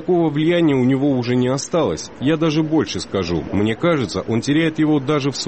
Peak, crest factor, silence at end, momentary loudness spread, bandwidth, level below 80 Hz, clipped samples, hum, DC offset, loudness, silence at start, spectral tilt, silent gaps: -6 dBFS; 12 dB; 0 s; 5 LU; 8.8 kHz; -46 dBFS; under 0.1%; none; 0.2%; -18 LUFS; 0 s; -6 dB/octave; none